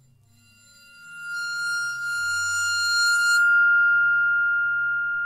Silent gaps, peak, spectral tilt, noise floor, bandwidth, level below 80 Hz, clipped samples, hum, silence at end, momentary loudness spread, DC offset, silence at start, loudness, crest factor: none; -12 dBFS; 2.5 dB/octave; -57 dBFS; 15 kHz; -70 dBFS; under 0.1%; none; 0 s; 11 LU; under 0.1%; 1 s; -20 LUFS; 10 dB